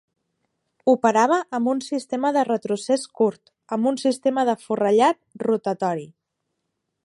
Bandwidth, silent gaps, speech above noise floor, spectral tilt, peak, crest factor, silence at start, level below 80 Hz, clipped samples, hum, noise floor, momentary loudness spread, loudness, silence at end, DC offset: 11.5 kHz; none; 57 dB; -5 dB/octave; -4 dBFS; 18 dB; 0.85 s; -76 dBFS; under 0.1%; none; -78 dBFS; 8 LU; -22 LUFS; 1 s; under 0.1%